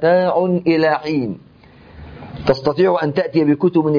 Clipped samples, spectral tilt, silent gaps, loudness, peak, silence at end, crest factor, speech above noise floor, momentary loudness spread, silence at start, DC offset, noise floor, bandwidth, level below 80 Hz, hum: under 0.1%; -8.5 dB/octave; none; -17 LUFS; -4 dBFS; 0 s; 14 dB; 28 dB; 12 LU; 0 s; under 0.1%; -44 dBFS; 5.2 kHz; -48 dBFS; none